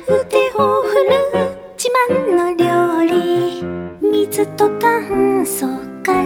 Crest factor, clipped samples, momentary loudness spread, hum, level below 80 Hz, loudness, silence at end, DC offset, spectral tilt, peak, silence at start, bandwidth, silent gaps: 14 dB; under 0.1%; 7 LU; none; -50 dBFS; -16 LUFS; 0 s; under 0.1%; -4.5 dB/octave; -2 dBFS; 0 s; 18 kHz; none